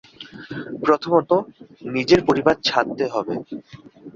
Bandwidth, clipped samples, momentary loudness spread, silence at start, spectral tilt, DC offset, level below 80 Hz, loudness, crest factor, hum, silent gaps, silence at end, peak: 7.6 kHz; under 0.1%; 20 LU; 0.2 s; -5.5 dB/octave; under 0.1%; -54 dBFS; -20 LUFS; 20 dB; none; none; 0.05 s; -2 dBFS